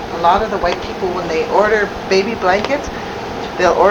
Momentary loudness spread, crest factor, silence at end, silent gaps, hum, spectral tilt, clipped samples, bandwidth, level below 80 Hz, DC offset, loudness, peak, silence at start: 11 LU; 16 dB; 0 s; none; none; -4.5 dB/octave; under 0.1%; 19 kHz; -36 dBFS; under 0.1%; -16 LUFS; 0 dBFS; 0 s